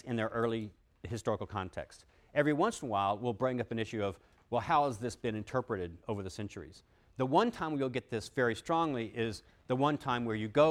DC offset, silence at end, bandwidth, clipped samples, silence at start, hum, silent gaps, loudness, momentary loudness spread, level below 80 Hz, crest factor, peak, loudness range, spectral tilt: under 0.1%; 0 s; 14.5 kHz; under 0.1%; 0.05 s; none; none; -34 LUFS; 13 LU; -62 dBFS; 22 dB; -12 dBFS; 2 LU; -6 dB/octave